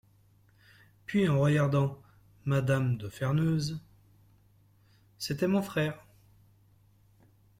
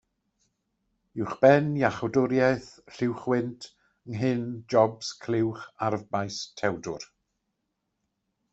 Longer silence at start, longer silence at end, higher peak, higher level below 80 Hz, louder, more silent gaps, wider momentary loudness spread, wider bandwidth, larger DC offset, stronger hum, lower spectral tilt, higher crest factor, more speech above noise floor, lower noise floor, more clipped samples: about the same, 1.1 s vs 1.15 s; about the same, 1.6 s vs 1.5 s; second, -16 dBFS vs -4 dBFS; about the same, -62 dBFS vs -64 dBFS; second, -30 LUFS vs -27 LUFS; neither; second, 14 LU vs 17 LU; first, 15.5 kHz vs 8.2 kHz; neither; neither; about the same, -7 dB/octave vs -6 dB/octave; second, 16 dB vs 24 dB; second, 35 dB vs 54 dB; second, -63 dBFS vs -80 dBFS; neither